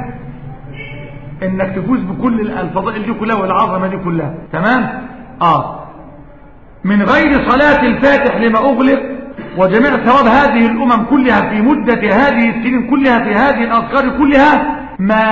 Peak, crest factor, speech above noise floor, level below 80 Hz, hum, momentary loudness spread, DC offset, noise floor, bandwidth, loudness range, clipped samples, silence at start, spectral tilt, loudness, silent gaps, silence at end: 0 dBFS; 12 dB; 26 dB; -36 dBFS; none; 17 LU; 0.7%; -38 dBFS; 7.4 kHz; 6 LU; under 0.1%; 0 s; -7.5 dB/octave; -12 LUFS; none; 0 s